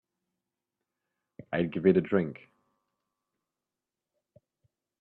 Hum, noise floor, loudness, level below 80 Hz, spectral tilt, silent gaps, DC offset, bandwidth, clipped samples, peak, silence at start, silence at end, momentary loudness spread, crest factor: none; -90 dBFS; -28 LUFS; -70 dBFS; -10.5 dB/octave; none; under 0.1%; 4.2 kHz; under 0.1%; -10 dBFS; 1.5 s; 2.65 s; 13 LU; 24 dB